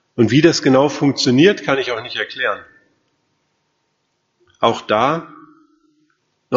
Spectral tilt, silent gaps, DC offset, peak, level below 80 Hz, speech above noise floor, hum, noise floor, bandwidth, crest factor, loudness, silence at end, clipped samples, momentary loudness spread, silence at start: -4 dB/octave; none; under 0.1%; 0 dBFS; -58 dBFS; 53 dB; none; -69 dBFS; 7.8 kHz; 18 dB; -16 LUFS; 0 s; under 0.1%; 10 LU; 0.15 s